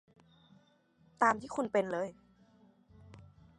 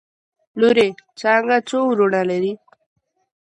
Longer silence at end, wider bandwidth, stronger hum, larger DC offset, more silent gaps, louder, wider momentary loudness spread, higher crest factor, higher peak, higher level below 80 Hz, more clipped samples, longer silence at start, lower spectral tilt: second, 0.4 s vs 0.9 s; about the same, 11.5 kHz vs 10.5 kHz; neither; neither; neither; second, -33 LUFS vs -18 LUFS; first, 22 LU vs 10 LU; first, 24 dB vs 16 dB; second, -14 dBFS vs -4 dBFS; about the same, -70 dBFS vs -66 dBFS; neither; first, 1.2 s vs 0.55 s; about the same, -5.5 dB/octave vs -5.5 dB/octave